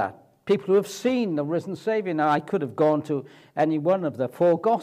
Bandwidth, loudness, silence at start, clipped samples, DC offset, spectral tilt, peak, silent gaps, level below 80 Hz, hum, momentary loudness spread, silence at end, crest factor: 15 kHz; -24 LUFS; 0 s; under 0.1%; under 0.1%; -6.5 dB/octave; -8 dBFS; none; -74 dBFS; none; 8 LU; 0 s; 14 dB